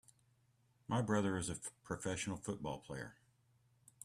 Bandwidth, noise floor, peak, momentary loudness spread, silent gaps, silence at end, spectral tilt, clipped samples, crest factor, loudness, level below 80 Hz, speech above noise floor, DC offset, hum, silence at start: 14 kHz; -75 dBFS; -22 dBFS; 13 LU; none; 0.9 s; -5 dB/octave; under 0.1%; 20 dB; -41 LUFS; -68 dBFS; 34 dB; under 0.1%; none; 0.9 s